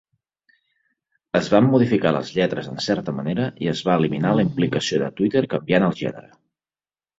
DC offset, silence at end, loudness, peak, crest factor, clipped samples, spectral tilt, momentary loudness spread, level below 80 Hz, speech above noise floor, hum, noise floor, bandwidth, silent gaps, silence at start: under 0.1%; 0.95 s; -21 LUFS; -2 dBFS; 18 dB; under 0.1%; -6.5 dB/octave; 8 LU; -56 dBFS; over 70 dB; none; under -90 dBFS; 8 kHz; none; 1.35 s